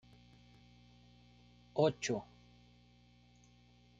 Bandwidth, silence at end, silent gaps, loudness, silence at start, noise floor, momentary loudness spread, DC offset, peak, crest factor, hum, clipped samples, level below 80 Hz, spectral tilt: 9 kHz; 1.75 s; none; -36 LUFS; 1.75 s; -65 dBFS; 27 LU; under 0.1%; -18 dBFS; 24 dB; 60 Hz at -60 dBFS; under 0.1%; -70 dBFS; -5 dB/octave